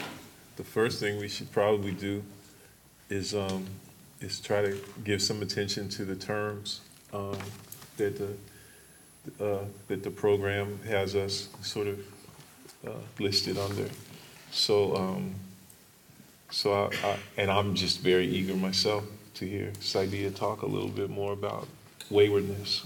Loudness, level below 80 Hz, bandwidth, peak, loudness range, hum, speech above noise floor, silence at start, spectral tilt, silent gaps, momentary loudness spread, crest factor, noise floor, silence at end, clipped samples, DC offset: -30 LUFS; -66 dBFS; 17 kHz; -10 dBFS; 6 LU; none; 26 dB; 0 s; -4.5 dB/octave; none; 18 LU; 22 dB; -57 dBFS; 0 s; under 0.1%; under 0.1%